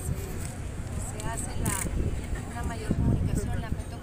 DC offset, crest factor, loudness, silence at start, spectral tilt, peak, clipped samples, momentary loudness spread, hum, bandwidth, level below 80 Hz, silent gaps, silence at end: under 0.1%; 18 dB; -32 LUFS; 0 s; -5.5 dB/octave; -12 dBFS; under 0.1%; 9 LU; none; 16 kHz; -36 dBFS; none; 0 s